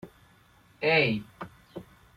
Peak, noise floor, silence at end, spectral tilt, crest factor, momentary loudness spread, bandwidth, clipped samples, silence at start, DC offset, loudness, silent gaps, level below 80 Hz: -10 dBFS; -60 dBFS; 0.35 s; -6.5 dB/octave; 22 dB; 23 LU; 14.5 kHz; under 0.1%; 0.05 s; under 0.1%; -26 LUFS; none; -64 dBFS